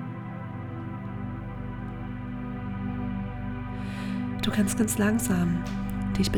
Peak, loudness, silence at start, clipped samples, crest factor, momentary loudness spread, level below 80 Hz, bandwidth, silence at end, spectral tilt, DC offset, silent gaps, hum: -12 dBFS; -30 LUFS; 0 s; under 0.1%; 18 dB; 12 LU; -42 dBFS; 19.5 kHz; 0 s; -5.5 dB/octave; under 0.1%; none; 50 Hz at -50 dBFS